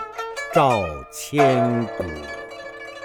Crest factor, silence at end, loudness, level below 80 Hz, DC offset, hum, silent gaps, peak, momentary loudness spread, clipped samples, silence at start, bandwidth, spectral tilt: 20 dB; 0 s; -21 LUFS; -48 dBFS; under 0.1%; none; none; -2 dBFS; 17 LU; under 0.1%; 0 s; 19.5 kHz; -5.5 dB/octave